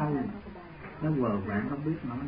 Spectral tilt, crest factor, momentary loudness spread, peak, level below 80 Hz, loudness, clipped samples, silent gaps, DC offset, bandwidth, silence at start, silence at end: -12 dB/octave; 14 dB; 16 LU; -16 dBFS; -54 dBFS; -32 LUFS; under 0.1%; none; under 0.1%; 5.2 kHz; 0 s; 0 s